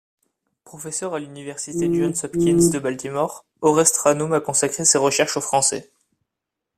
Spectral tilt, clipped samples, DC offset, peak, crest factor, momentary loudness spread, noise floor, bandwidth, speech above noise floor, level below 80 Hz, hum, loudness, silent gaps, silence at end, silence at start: -3.5 dB/octave; under 0.1%; under 0.1%; -2 dBFS; 20 dB; 13 LU; -83 dBFS; 15.5 kHz; 63 dB; -56 dBFS; none; -20 LUFS; none; 0.95 s; 0.75 s